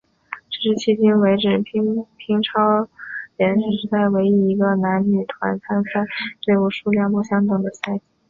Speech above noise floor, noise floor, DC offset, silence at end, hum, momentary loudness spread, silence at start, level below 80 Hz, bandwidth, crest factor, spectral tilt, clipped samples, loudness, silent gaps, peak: 19 dB; -38 dBFS; under 0.1%; 0.3 s; none; 10 LU; 0.3 s; -60 dBFS; 7.2 kHz; 16 dB; -7 dB/octave; under 0.1%; -19 LUFS; none; -4 dBFS